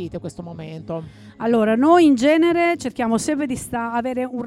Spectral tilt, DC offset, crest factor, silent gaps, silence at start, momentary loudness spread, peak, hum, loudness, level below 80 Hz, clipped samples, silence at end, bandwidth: -5.5 dB/octave; under 0.1%; 16 dB; none; 0 s; 18 LU; -4 dBFS; none; -18 LUFS; -52 dBFS; under 0.1%; 0 s; 13.5 kHz